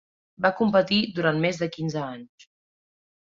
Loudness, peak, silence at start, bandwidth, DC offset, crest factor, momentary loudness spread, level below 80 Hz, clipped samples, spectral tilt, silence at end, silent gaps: -24 LUFS; -6 dBFS; 0.4 s; 7.6 kHz; under 0.1%; 20 dB; 12 LU; -64 dBFS; under 0.1%; -6 dB/octave; 1 s; none